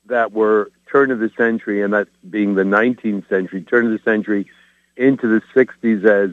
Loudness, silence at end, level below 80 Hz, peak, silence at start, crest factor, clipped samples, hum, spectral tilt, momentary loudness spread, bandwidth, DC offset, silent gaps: -17 LUFS; 0 s; -68 dBFS; 0 dBFS; 0.1 s; 18 dB; under 0.1%; none; -8.5 dB/octave; 6 LU; 6.8 kHz; under 0.1%; none